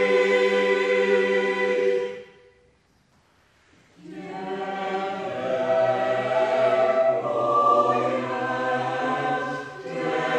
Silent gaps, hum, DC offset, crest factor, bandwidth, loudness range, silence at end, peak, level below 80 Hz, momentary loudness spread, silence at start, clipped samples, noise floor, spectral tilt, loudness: none; none; under 0.1%; 16 dB; 9.6 kHz; 10 LU; 0 s; -8 dBFS; -70 dBFS; 13 LU; 0 s; under 0.1%; -62 dBFS; -5.5 dB/octave; -23 LUFS